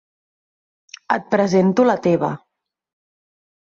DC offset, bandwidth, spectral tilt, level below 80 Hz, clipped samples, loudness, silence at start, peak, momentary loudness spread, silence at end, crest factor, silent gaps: under 0.1%; 7.6 kHz; -7 dB/octave; -62 dBFS; under 0.1%; -18 LUFS; 1.1 s; -4 dBFS; 9 LU; 1.3 s; 18 dB; none